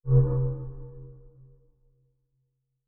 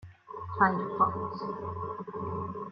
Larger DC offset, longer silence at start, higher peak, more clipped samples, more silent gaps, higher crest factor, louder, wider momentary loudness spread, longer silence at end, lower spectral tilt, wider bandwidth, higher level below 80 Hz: neither; about the same, 0.05 s vs 0 s; about the same, -10 dBFS vs -10 dBFS; neither; neither; about the same, 20 dB vs 22 dB; first, -26 LUFS vs -31 LUFS; first, 25 LU vs 13 LU; first, 1.6 s vs 0 s; first, -15.5 dB/octave vs -9.5 dB/octave; second, 1.6 kHz vs 6 kHz; first, -40 dBFS vs -64 dBFS